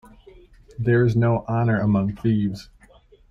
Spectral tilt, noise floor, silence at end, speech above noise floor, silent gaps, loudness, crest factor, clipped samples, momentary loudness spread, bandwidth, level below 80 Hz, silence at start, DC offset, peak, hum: -9.5 dB/octave; -53 dBFS; 0.65 s; 32 dB; none; -21 LUFS; 14 dB; under 0.1%; 9 LU; 6.8 kHz; -48 dBFS; 0.8 s; under 0.1%; -8 dBFS; none